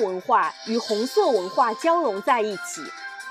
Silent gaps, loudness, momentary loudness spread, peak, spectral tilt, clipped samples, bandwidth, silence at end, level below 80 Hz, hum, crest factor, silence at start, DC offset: none; -23 LUFS; 12 LU; -6 dBFS; -3.5 dB/octave; under 0.1%; 15.5 kHz; 0 s; -80 dBFS; none; 16 dB; 0 s; under 0.1%